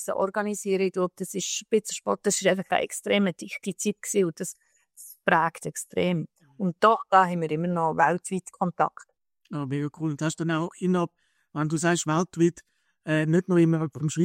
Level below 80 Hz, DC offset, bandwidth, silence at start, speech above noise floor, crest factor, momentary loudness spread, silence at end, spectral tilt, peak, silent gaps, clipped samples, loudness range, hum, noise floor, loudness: -70 dBFS; under 0.1%; 16 kHz; 0 s; 24 dB; 20 dB; 10 LU; 0 s; -5 dB/octave; -6 dBFS; none; under 0.1%; 4 LU; none; -50 dBFS; -26 LUFS